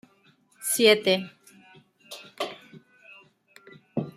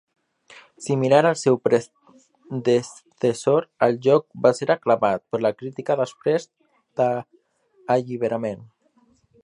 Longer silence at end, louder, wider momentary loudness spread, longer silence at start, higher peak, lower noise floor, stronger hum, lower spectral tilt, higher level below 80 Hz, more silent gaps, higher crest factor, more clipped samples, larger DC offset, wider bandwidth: second, 0.05 s vs 0.8 s; about the same, -24 LUFS vs -22 LUFS; first, 24 LU vs 13 LU; about the same, 0.6 s vs 0.55 s; about the same, -4 dBFS vs -2 dBFS; about the same, -62 dBFS vs -61 dBFS; neither; second, -3 dB/octave vs -6 dB/octave; second, -78 dBFS vs -68 dBFS; neither; about the same, 24 dB vs 22 dB; neither; neither; first, 16 kHz vs 11.5 kHz